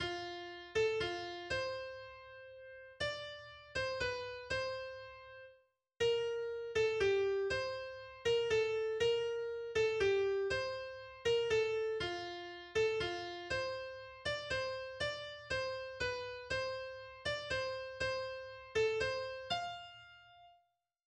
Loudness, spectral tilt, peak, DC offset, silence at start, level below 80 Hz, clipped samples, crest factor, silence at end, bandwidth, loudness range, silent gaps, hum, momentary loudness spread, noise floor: -38 LUFS; -3.5 dB/octave; -22 dBFS; under 0.1%; 0 s; -62 dBFS; under 0.1%; 16 dB; 0.55 s; 9.8 kHz; 6 LU; none; none; 15 LU; -78 dBFS